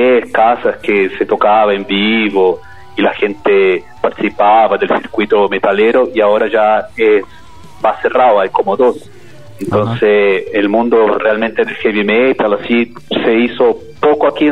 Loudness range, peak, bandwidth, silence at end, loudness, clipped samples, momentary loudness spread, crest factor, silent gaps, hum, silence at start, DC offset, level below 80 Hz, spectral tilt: 2 LU; 0 dBFS; 9.4 kHz; 0 s; -12 LUFS; under 0.1%; 6 LU; 12 dB; none; none; 0 s; 1%; -50 dBFS; -7 dB/octave